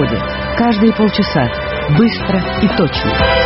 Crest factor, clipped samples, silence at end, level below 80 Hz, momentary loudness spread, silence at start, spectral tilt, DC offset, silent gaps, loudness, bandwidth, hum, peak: 14 dB; under 0.1%; 0 s; -28 dBFS; 5 LU; 0 s; -4.5 dB/octave; under 0.1%; none; -14 LUFS; 5.8 kHz; none; 0 dBFS